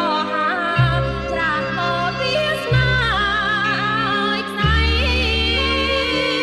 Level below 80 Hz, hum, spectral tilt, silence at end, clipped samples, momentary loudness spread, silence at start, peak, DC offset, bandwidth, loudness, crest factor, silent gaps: -28 dBFS; none; -5.5 dB/octave; 0 s; under 0.1%; 3 LU; 0 s; -4 dBFS; under 0.1%; 12.5 kHz; -18 LUFS; 14 dB; none